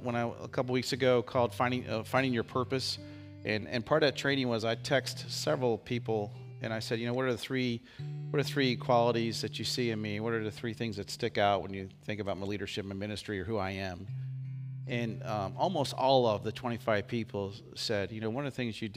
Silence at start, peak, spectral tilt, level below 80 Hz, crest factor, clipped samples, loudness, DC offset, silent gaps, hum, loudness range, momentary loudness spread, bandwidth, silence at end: 0 s; -12 dBFS; -5.5 dB/octave; -66 dBFS; 20 dB; under 0.1%; -33 LUFS; under 0.1%; none; none; 4 LU; 11 LU; 15.5 kHz; 0 s